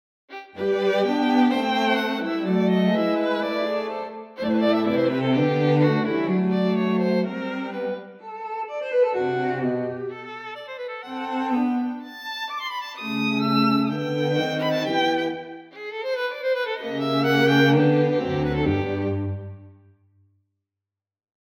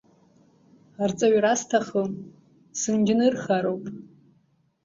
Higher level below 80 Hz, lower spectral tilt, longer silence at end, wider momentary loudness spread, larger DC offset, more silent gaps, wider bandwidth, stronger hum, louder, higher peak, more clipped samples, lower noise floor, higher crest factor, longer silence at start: first, -54 dBFS vs -66 dBFS; first, -7 dB/octave vs -4.5 dB/octave; first, 1.8 s vs 0.8 s; about the same, 14 LU vs 15 LU; neither; neither; first, 17 kHz vs 7.8 kHz; neither; about the same, -23 LUFS vs -24 LUFS; about the same, -6 dBFS vs -8 dBFS; neither; first, under -90 dBFS vs -66 dBFS; about the same, 18 dB vs 18 dB; second, 0.3 s vs 1 s